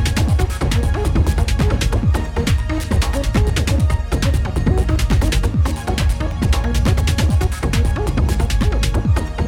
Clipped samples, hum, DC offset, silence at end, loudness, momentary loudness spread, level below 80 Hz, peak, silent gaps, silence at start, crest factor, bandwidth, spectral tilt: under 0.1%; none; under 0.1%; 0 s; -18 LUFS; 2 LU; -18 dBFS; -4 dBFS; none; 0 s; 12 dB; 16 kHz; -6 dB/octave